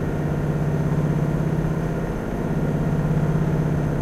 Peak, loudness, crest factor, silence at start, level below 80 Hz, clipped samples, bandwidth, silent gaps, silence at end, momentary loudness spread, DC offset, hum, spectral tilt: -10 dBFS; -23 LUFS; 12 dB; 0 s; -34 dBFS; under 0.1%; 13 kHz; none; 0 s; 4 LU; under 0.1%; 50 Hz at -40 dBFS; -9 dB/octave